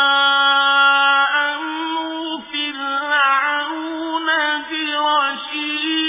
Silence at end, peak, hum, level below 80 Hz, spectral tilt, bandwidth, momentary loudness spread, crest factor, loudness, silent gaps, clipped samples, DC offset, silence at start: 0 s; -2 dBFS; none; -68 dBFS; -3.5 dB/octave; 3.9 kHz; 11 LU; 16 dB; -17 LUFS; none; under 0.1%; under 0.1%; 0 s